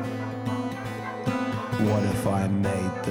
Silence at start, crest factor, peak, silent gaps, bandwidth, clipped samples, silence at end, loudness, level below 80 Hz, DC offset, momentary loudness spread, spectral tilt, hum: 0 s; 16 dB; -10 dBFS; none; 19 kHz; under 0.1%; 0 s; -27 LUFS; -52 dBFS; under 0.1%; 8 LU; -7 dB/octave; none